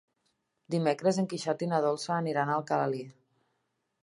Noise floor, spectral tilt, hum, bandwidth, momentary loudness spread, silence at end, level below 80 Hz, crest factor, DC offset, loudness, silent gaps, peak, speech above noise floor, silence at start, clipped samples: -79 dBFS; -6 dB/octave; none; 11.5 kHz; 6 LU; 0.9 s; -80 dBFS; 18 dB; under 0.1%; -30 LUFS; none; -14 dBFS; 50 dB; 0.7 s; under 0.1%